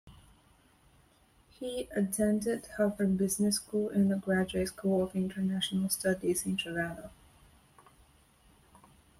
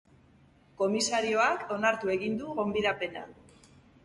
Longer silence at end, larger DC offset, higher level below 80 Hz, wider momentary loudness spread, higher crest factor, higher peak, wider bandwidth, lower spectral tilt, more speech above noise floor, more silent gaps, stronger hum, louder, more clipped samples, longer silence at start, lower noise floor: first, 2.1 s vs 0.7 s; neither; about the same, -60 dBFS vs -64 dBFS; about the same, 8 LU vs 9 LU; about the same, 16 dB vs 18 dB; about the same, -16 dBFS vs -14 dBFS; first, 15.5 kHz vs 11.5 kHz; first, -5 dB/octave vs -3.5 dB/octave; about the same, 34 dB vs 31 dB; neither; neither; about the same, -31 LUFS vs -29 LUFS; neither; second, 0.05 s vs 0.8 s; first, -65 dBFS vs -61 dBFS